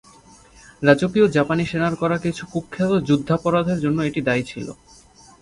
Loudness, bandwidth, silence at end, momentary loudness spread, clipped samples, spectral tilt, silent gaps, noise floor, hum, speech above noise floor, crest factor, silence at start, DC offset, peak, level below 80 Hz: -20 LUFS; 11.5 kHz; 0.7 s; 11 LU; under 0.1%; -7 dB/octave; none; -49 dBFS; none; 29 dB; 20 dB; 0.8 s; under 0.1%; 0 dBFS; -50 dBFS